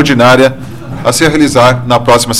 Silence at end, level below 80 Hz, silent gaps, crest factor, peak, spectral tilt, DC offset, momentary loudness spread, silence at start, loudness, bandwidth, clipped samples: 0 s; -32 dBFS; none; 8 dB; 0 dBFS; -4.5 dB/octave; under 0.1%; 10 LU; 0 s; -8 LUFS; 16.5 kHz; 0.3%